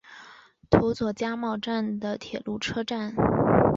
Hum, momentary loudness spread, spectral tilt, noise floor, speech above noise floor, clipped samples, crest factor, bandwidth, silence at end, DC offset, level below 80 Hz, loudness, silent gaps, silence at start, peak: none; 11 LU; -7 dB/octave; -52 dBFS; 24 dB; under 0.1%; 22 dB; 7.8 kHz; 0 s; under 0.1%; -46 dBFS; -27 LUFS; none; 0.1 s; -4 dBFS